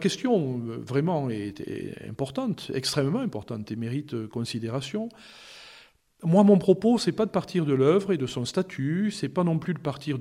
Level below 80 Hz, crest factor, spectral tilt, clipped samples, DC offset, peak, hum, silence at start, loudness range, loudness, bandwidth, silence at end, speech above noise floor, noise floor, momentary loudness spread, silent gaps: -64 dBFS; 20 dB; -6.5 dB/octave; under 0.1%; under 0.1%; -6 dBFS; none; 0 s; 7 LU; -26 LUFS; 14 kHz; 0 s; 29 dB; -54 dBFS; 14 LU; none